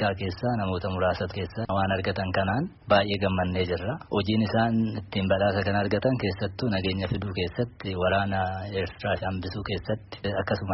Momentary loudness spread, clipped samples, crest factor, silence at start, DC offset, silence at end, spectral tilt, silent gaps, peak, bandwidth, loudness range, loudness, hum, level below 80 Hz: 7 LU; under 0.1%; 18 dB; 0 s; under 0.1%; 0 s; -5 dB/octave; none; -8 dBFS; 6 kHz; 3 LU; -27 LUFS; none; -50 dBFS